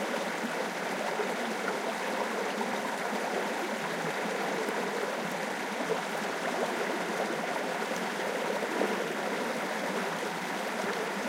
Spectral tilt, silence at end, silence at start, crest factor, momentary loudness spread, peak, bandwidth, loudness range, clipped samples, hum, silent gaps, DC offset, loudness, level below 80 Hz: -3.5 dB/octave; 0 s; 0 s; 16 dB; 2 LU; -16 dBFS; 16 kHz; 1 LU; under 0.1%; none; none; under 0.1%; -32 LUFS; -88 dBFS